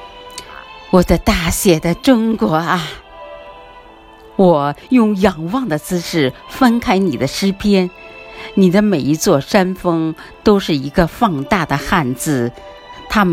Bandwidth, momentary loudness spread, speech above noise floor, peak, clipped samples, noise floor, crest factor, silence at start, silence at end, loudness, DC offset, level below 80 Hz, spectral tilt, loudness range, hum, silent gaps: 16.5 kHz; 19 LU; 26 dB; 0 dBFS; under 0.1%; -40 dBFS; 16 dB; 0 s; 0 s; -15 LUFS; under 0.1%; -34 dBFS; -5.5 dB/octave; 2 LU; none; none